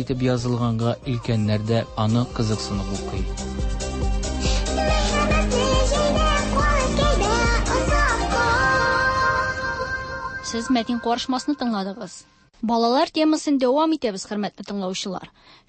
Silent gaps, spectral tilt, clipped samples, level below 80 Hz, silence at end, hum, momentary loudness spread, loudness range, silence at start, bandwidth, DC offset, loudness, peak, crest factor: none; -5 dB/octave; under 0.1%; -28 dBFS; 0.4 s; none; 9 LU; 5 LU; 0 s; 8.8 kHz; under 0.1%; -22 LUFS; -8 dBFS; 14 dB